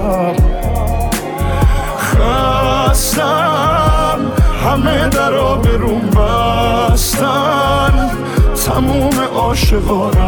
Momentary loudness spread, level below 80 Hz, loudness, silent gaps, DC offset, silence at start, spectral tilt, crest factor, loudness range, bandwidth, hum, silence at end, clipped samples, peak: 3 LU; -16 dBFS; -13 LUFS; none; under 0.1%; 0 s; -5 dB/octave; 12 dB; 1 LU; over 20 kHz; none; 0 s; under 0.1%; 0 dBFS